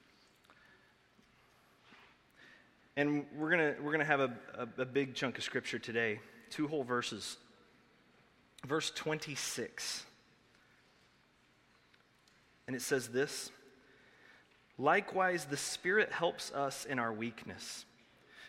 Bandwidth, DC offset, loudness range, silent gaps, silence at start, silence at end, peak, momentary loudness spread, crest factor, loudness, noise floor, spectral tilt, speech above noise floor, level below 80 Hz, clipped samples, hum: 16 kHz; under 0.1%; 8 LU; none; 1.9 s; 0 s; -14 dBFS; 14 LU; 26 dB; -36 LUFS; -69 dBFS; -3.5 dB/octave; 33 dB; -78 dBFS; under 0.1%; none